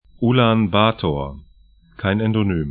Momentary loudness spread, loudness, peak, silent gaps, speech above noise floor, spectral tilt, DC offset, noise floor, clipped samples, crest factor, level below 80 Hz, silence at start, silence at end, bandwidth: 10 LU; -19 LUFS; 0 dBFS; none; 33 dB; -12 dB/octave; under 0.1%; -51 dBFS; under 0.1%; 18 dB; -40 dBFS; 0.2 s; 0 s; 4.7 kHz